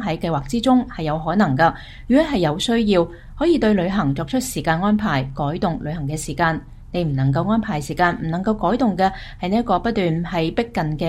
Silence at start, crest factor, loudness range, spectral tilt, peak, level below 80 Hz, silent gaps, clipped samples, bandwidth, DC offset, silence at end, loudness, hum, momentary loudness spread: 0 s; 16 dB; 3 LU; -6 dB/octave; -2 dBFS; -38 dBFS; none; under 0.1%; 14 kHz; under 0.1%; 0 s; -20 LUFS; none; 7 LU